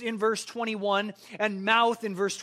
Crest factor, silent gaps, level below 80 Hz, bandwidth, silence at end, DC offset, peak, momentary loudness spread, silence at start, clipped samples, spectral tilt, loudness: 20 dB; none; -80 dBFS; 15 kHz; 0 s; under 0.1%; -8 dBFS; 8 LU; 0 s; under 0.1%; -3.5 dB/octave; -27 LUFS